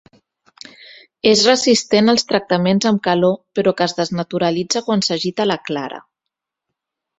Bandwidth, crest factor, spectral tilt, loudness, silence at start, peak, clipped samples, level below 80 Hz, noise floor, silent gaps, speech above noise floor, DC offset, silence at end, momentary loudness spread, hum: 8.2 kHz; 18 dB; -4 dB/octave; -16 LUFS; 1.25 s; 0 dBFS; under 0.1%; -58 dBFS; -82 dBFS; none; 65 dB; under 0.1%; 1.2 s; 10 LU; none